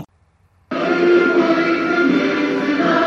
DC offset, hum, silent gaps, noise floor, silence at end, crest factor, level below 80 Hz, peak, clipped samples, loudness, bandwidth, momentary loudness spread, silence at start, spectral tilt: under 0.1%; none; none; -57 dBFS; 0 s; 14 dB; -60 dBFS; -2 dBFS; under 0.1%; -16 LUFS; 7 kHz; 6 LU; 0 s; -6 dB/octave